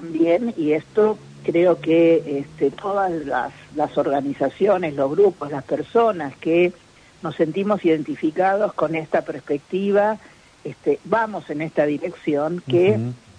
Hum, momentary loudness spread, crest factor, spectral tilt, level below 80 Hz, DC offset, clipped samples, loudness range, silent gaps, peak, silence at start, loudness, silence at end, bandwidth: none; 9 LU; 16 dB; -7.5 dB/octave; -60 dBFS; under 0.1%; under 0.1%; 3 LU; none; -6 dBFS; 0 s; -21 LUFS; 0.25 s; 10 kHz